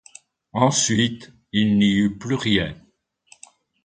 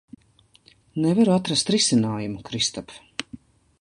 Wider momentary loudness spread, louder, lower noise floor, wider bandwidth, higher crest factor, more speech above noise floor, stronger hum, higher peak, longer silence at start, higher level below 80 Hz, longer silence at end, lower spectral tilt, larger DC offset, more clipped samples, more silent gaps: second, 11 LU vs 16 LU; about the same, -20 LUFS vs -22 LUFS; about the same, -56 dBFS vs -59 dBFS; second, 9.6 kHz vs 11.5 kHz; about the same, 18 dB vs 18 dB; about the same, 36 dB vs 37 dB; neither; about the same, -4 dBFS vs -6 dBFS; second, 0.55 s vs 0.95 s; first, -50 dBFS vs -58 dBFS; first, 1.1 s vs 0.45 s; about the same, -4 dB/octave vs -4 dB/octave; neither; neither; neither